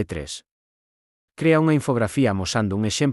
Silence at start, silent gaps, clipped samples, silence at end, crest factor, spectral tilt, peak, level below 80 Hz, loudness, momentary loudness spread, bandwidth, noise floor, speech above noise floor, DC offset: 0 s; 0.51-1.28 s; under 0.1%; 0 s; 16 dB; -5.5 dB/octave; -6 dBFS; -50 dBFS; -21 LUFS; 13 LU; 12 kHz; under -90 dBFS; over 69 dB; under 0.1%